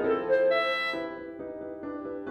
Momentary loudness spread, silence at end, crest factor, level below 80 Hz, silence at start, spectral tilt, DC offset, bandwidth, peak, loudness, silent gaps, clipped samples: 14 LU; 0 s; 14 dB; -64 dBFS; 0 s; -5 dB/octave; under 0.1%; 8.4 kHz; -16 dBFS; -29 LUFS; none; under 0.1%